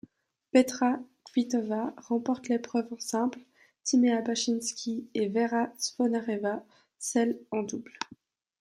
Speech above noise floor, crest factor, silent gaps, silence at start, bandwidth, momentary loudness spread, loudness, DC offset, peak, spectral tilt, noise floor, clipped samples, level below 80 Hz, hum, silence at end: 31 dB; 20 dB; none; 0.55 s; 14.5 kHz; 12 LU; -30 LUFS; under 0.1%; -10 dBFS; -3.5 dB/octave; -59 dBFS; under 0.1%; -78 dBFS; none; 0.55 s